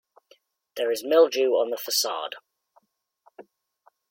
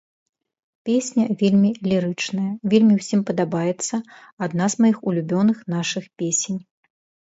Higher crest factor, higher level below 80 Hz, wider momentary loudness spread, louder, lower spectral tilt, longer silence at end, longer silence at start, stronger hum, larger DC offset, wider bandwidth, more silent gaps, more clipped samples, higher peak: about the same, 20 dB vs 16 dB; second, -82 dBFS vs -64 dBFS; first, 17 LU vs 10 LU; second, -24 LUFS vs -21 LUFS; second, -0.5 dB/octave vs -5.5 dB/octave; first, 1.75 s vs 0.6 s; about the same, 0.75 s vs 0.85 s; neither; neither; first, 16.5 kHz vs 8 kHz; second, none vs 4.33-4.37 s; neither; about the same, -6 dBFS vs -4 dBFS